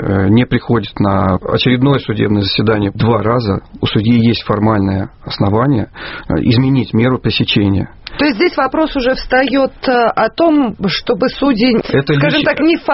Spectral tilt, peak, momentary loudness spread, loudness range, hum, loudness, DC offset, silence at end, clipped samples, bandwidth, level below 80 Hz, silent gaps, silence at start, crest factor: -5 dB/octave; 0 dBFS; 5 LU; 1 LU; none; -13 LUFS; under 0.1%; 0 s; under 0.1%; 6 kHz; -36 dBFS; none; 0 s; 12 dB